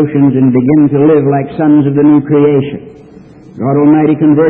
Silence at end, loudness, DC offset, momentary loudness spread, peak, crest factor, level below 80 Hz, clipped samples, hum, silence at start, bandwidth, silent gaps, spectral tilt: 0 s; -9 LUFS; under 0.1%; 6 LU; 0 dBFS; 8 dB; -46 dBFS; under 0.1%; none; 0 s; 3.7 kHz; none; -12 dB/octave